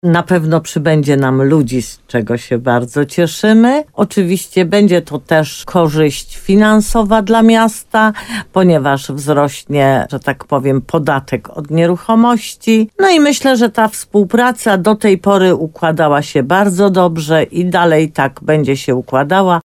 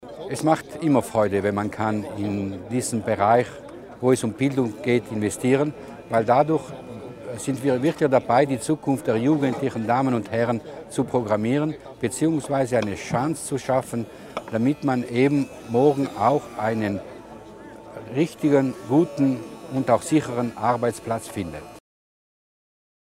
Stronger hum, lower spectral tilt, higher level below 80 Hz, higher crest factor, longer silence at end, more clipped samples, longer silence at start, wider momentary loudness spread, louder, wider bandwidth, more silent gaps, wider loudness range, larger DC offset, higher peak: neither; about the same, -6 dB/octave vs -6.5 dB/octave; first, -38 dBFS vs -58 dBFS; second, 12 dB vs 18 dB; second, 0.05 s vs 1.35 s; neither; about the same, 0.05 s vs 0 s; second, 7 LU vs 12 LU; first, -12 LUFS vs -23 LUFS; about the same, 15.5 kHz vs 16 kHz; neither; about the same, 2 LU vs 2 LU; neither; first, 0 dBFS vs -4 dBFS